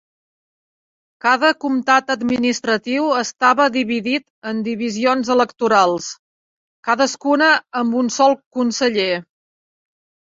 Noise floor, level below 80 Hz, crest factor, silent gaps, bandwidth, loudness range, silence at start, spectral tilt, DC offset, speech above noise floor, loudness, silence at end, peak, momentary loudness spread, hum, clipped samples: under -90 dBFS; -62 dBFS; 18 dB; 4.30-4.42 s, 6.19-6.83 s, 8.46-8.51 s; 7.8 kHz; 2 LU; 1.25 s; -3 dB/octave; under 0.1%; over 73 dB; -17 LUFS; 1.05 s; -2 dBFS; 8 LU; none; under 0.1%